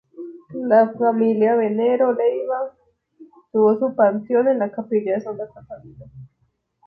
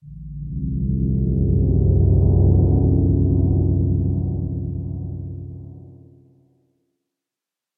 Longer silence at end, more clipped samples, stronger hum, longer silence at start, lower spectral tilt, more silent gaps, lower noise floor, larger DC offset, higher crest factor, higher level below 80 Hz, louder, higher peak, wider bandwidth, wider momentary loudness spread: second, 0.6 s vs 1.85 s; neither; neither; about the same, 0.15 s vs 0.05 s; second, -9.5 dB/octave vs -17 dB/octave; neither; second, -68 dBFS vs -87 dBFS; neither; about the same, 16 dB vs 14 dB; second, -64 dBFS vs -26 dBFS; about the same, -19 LUFS vs -19 LUFS; about the same, -4 dBFS vs -4 dBFS; first, 4.6 kHz vs 1.1 kHz; about the same, 17 LU vs 17 LU